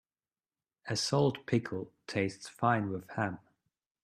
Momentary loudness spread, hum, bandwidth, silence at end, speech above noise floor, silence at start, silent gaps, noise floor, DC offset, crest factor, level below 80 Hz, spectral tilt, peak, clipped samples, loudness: 11 LU; none; 14 kHz; 0.65 s; over 57 dB; 0.85 s; none; under -90 dBFS; under 0.1%; 22 dB; -70 dBFS; -5 dB/octave; -14 dBFS; under 0.1%; -33 LUFS